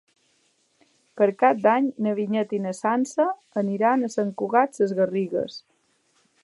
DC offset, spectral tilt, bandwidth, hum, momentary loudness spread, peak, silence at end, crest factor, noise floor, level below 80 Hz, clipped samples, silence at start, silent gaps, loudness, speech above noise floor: under 0.1%; -6.5 dB/octave; 11.5 kHz; none; 8 LU; -4 dBFS; 0.85 s; 20 dB; -66 dBFS; -78 dBFS; under 0.1%; 1.15 s; none; -23 LUFS; 44 dB